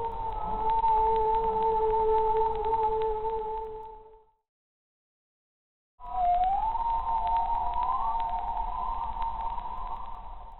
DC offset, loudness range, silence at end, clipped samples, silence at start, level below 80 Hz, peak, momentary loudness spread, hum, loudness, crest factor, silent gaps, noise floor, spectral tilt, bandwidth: 0.7%; 8 LU; 0 s; under 0.1%; 0 s; -42 dBFS; -16 dBFS; 13 LU; none; -29 LUFS; 14 dB; 4.49-5.98 s; -55 dBFS; -8.5 dB/octave; 4.2 kHz